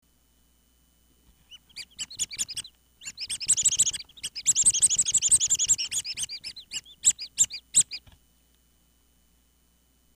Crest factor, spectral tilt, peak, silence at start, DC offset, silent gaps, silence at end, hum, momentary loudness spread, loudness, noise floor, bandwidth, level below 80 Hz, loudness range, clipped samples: 20 dB; 2.5 dB/octave; -10 dBFS; 1.5 s; under 0.1%; none; 2.2 s; none; 17 LU; -23 LUFS; -65 dBFS; 15.5 kHz; -60 dBFS; 8 LU; under 0.1%